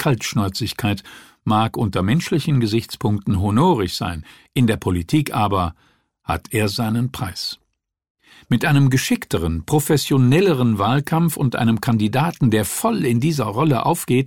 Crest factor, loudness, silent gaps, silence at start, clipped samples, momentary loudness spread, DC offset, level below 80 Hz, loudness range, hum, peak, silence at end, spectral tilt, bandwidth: 14 dB; -19 LUFS; 8.10-8.15 s; 0 s; under 0.1%; 9 LU; 0.3%; -44 dBFS; 4 LU; none; -4 dBFS; 0 s; -6 dB/octave; 17.5 kHz